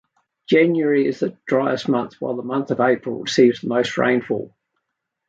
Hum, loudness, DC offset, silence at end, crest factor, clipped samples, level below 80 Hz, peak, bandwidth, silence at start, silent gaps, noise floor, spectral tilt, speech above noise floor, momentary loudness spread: none; -20 LUFS; under 0.1%; 0.8 s; 18 dB; under 0.1%; -66 dBFS; -2 dBFS; 7.8 kHz; 0.5 s; none; -78 dBFS; -5.5 dB/octave; 59 dB; 10 LU